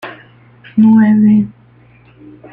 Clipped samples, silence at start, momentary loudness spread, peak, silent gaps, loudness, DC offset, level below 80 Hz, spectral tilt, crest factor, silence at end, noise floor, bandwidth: under 0.1%; 0.05 s; 15 LU; -2 dBFS; none; -10 LUFS; under 0.1%; -52 dBFS; -10.5 dB/octave; 12 dB; 1 s; -45 dBFS; 3.6 kHz